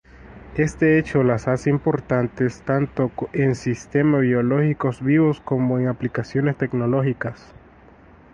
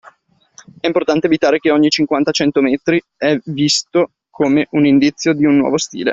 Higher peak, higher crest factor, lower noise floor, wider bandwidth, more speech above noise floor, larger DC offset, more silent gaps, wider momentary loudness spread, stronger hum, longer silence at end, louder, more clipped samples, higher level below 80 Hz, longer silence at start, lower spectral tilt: second, -6 dBFS vs -2 dBFS; about the same, 16 dB vs 14 dB; about the same, -48 dBFS vs -51 dBFS; first, 9.6 kHz vs 7.8 kHz; second, 28 dB vs 37 dB; neither; neither; about the same, 6 LU vs 5 LU; neither; first, 0.95 s vs 0 s; second, -21 LUFS vs -15 LUFS; neither; first, -48 dBFS vs -54 dBFS; second, 0.25 s vs 0.85 s; first, -8.5 dB/octave vs -4.5 dB/octave